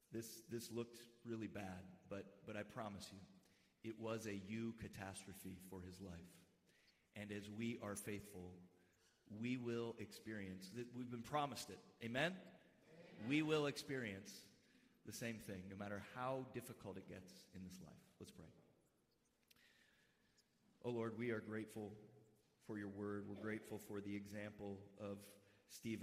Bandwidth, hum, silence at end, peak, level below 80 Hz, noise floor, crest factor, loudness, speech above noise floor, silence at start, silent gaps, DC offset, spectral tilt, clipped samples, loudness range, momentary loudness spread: 15.5 kHz; none; 0 s; -28 dBFS; -82 dBFS; -82 dBFS; 22 dB; -50 LUFS; 33 dB; 0.1 s; none; under 0.1%; -5 dB/octave; under 0.1%; 8 LU; 16 LU